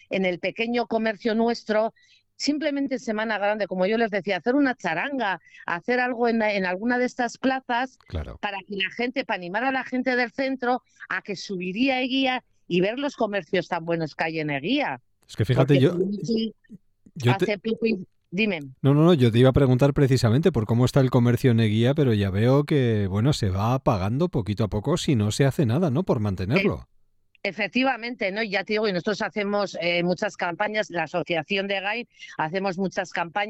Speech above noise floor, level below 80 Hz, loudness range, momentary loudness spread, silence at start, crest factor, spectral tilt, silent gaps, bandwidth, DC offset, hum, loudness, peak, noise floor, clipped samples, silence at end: 31 dB; -50 dBFS; 6 LU; 9 LU; 0.1 s; 18 dB; -6.5 dB/octave; none; 14.5 kHz; under 0.1%; none; -24 LUFS; -6 dBFS; -55 dBFS; under 0.1%; 0 s